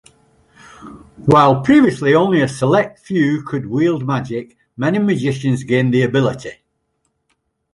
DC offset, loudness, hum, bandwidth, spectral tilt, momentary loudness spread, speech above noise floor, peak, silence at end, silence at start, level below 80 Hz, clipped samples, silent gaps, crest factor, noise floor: under 0.1%; -16 LUFS; none; 11.5 kHz; -7 dB/octave; 11 LU; 53 dB; 0 dBFS; 1.2 s; 0.8 s; -52 dBFS; under 0.1%; none; 16 dB; -69 dBFS